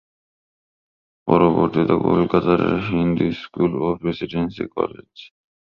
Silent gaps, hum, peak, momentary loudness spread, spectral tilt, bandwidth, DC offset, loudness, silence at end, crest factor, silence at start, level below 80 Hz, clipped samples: none; none; -2 dBFS; 9 LU; -9.5 dB/octave; 6 kHz; under 0.1%; -20 LUFS; 0.4 s; 18 dB; 1.25 s; -46 dBFS; under 0.1%